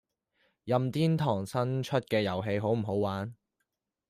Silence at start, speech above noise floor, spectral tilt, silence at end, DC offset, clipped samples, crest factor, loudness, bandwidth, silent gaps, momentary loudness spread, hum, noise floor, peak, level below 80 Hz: 0.65 s; 54 dB; -7 dB/octave; 0.75 s; under 0.1%; under 0.1%; 18 dB; -30 LUFS; 15 kHz; none; 6 LU; none; -84 dBFS; -14 dBFS; -68 dBFS